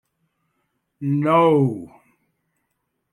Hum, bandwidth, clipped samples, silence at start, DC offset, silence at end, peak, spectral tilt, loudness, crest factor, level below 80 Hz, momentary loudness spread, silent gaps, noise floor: none; 11.5 kHz; under 0.1%; 1 s; under 0.1%; 1.25 s; -6 dBFS; -9 dB/octave; -18 LUFS; 18 dB; -68 dBFS; 15 LU; none; -75 dBFS